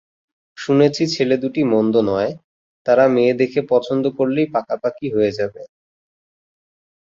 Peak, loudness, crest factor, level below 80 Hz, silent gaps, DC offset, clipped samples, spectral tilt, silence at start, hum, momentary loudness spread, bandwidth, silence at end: -2 dBFS; -18 LUFS; 16 dB; -58 dBFS; 2.44-2.85 s; under 0.1%; under 0.1%; -6.5 dB/octave; 0.6 s; none; 10 LU; 7.8 kHz; 1.35 s